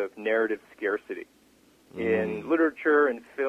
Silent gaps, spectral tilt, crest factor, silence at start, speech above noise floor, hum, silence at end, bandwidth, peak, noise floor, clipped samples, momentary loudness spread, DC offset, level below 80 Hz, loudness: none; -7 dB/octave; 18 dB; 0 s; 33 dB; none; 0 s; 8 kHz; -10 dBFS; -60 dBFS; under 0.1%; 13 LU; under 0.1%; -64 dBFS; -26 LUFS